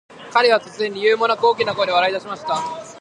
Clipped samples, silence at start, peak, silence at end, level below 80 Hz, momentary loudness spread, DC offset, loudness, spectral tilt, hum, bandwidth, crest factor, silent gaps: under 0.1%; 0.1 s; -2 dBFS; 0 s; -66 dBFS; 9 LU; under 0.1%; -19 LUFS; -3 dB/octave; none; 11 kHz; 18 dB; none